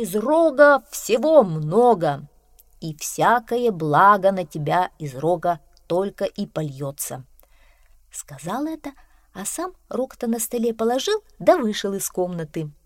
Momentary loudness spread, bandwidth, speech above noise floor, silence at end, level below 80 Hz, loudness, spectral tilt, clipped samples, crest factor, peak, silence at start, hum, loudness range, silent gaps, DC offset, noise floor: 16 LU; 16.5 kHz; 33 dB; 0.15 s; -56 dBFS; -21 LUFS; -5 dB/octave; under 0.1%; 20 dB; -2 dBFS; 0 s; none; 12 LU; none; under 0.1%; -54 dBFS